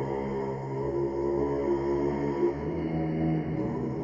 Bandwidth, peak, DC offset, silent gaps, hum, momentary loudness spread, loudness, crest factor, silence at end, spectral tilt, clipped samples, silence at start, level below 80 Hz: 7.4 kHz; -16 dBFS; under 0.1%; none; none; 4 LU; -30 LUFS; 14 dB; 0 s; -9.5 dB/octave; under 0.1%; 0 s; -48 dBFS